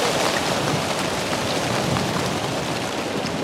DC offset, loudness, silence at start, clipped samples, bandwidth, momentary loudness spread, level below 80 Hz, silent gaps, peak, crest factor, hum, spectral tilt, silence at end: under 0.1%; -23 LUFS; 0 s; under 0.1%; 16.5 kHz; 4 LU; -48 dBFS; none; -6 dBFS; 18 dB; none; -3.5 dB/octave; 0 s